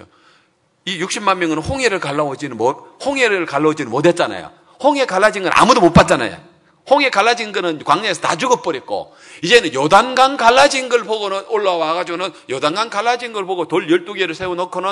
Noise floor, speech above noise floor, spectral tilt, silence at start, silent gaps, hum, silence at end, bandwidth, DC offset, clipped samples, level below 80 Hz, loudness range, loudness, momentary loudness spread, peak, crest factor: -58 dBFS; 43 dB; -4 dB/octave; 0.85 s; none; none; 0 s; 12 kHz; under 0.1%; 0.3%; -44 dBFS; 5 LU; -16 LUFS; 11 LU; 0 dBFS; 16 dB